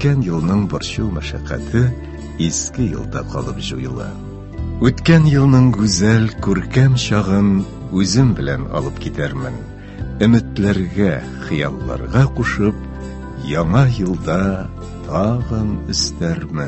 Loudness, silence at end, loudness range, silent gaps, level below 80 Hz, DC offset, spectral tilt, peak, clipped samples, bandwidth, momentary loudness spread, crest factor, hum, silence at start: -17 LUFS; 0 s; 7 LU; none; -30 dBFS; under 0.1%; -6 dB/octave; 0 dBFS; under 0.1%; 8.6 kHz; 14 LU; 16 dB; none; 0 s